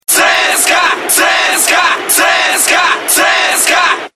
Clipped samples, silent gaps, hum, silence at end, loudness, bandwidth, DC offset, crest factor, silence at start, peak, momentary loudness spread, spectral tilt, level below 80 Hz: 0.1%; none; none; 0.05 s; -8 LUFS; over 20 kHz; 0.4%; 10 dB; 0.1 s; 0 dBFS; 2 LU; 1.5 dB/octave; -56 dBFS